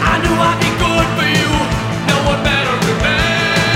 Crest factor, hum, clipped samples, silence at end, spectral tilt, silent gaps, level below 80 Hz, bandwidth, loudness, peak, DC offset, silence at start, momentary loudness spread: 14 dB; none; under 0.1%; 0 s; -4.5 dB/octave; none; -26 dBFS; 16.5 kHz; -14 LUFS; 0 dBFS; under 0.1%; 0 s; 2 LU